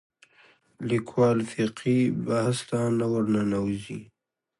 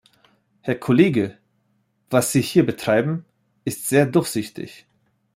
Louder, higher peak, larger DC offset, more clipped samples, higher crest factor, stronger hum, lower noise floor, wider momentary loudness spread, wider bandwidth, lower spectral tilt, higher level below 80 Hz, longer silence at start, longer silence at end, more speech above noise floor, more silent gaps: second, -26 LUFS vs -20 LUFS; second, -10 dBFS vs -2 dBFS; neither; neither; about the same, 16 dB vs 18 dB; neither; second, -60 dBFS vs -67 dBFS; second, 10 LU vs 15 LU; second, 11.5 kHz vs 16 kHz; first, -7 dB/octave vs -5.5 dB/octave; about the same, -60 dBFS vs -60 dBFS; first, 0.8 s vs 0.65 s; about the same, 0.55 s vs 0.6 s; second, 34 dB vs 48 dB; neither